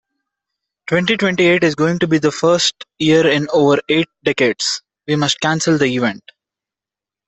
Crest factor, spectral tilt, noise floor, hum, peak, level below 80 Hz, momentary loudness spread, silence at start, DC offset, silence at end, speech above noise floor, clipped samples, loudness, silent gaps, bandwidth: 16 dB; -4.5 dB/octave; -88 dBFS; none; 0 dBFS; -56 dBFS; 7 LU; 0.9 s; under 0.1%; 1.1 s; 73 dB; under 0.1%; -15 LUFS; none; 8.4 kHz